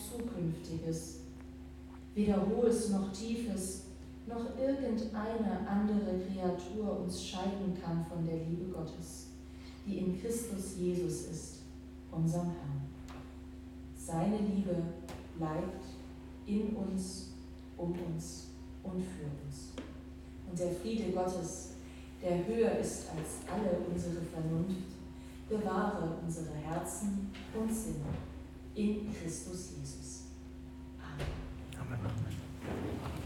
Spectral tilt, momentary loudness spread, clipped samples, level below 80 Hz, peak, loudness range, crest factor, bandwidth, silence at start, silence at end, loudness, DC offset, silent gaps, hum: -6.5 dB/octave; 16 LU; under 0.1%; -52 dBFS; -18 dBFS; 6 LU; 20 dB; 16.5 kHz; 0 s; 0 s; -38 LUFS; under 0.1%; none; none